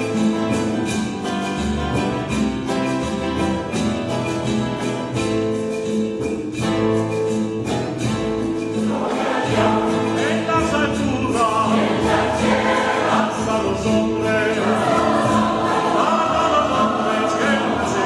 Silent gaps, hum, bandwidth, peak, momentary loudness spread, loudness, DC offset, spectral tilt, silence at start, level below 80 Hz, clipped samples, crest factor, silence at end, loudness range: none; none; 12.5 kHz; -4 dBFS; 6 LU; -20 LUFS; under 0.1%; -5.5 dB/octave; 0 s; -40 dBFS; under 0.1%; 16 dB; 0 s; 4 LU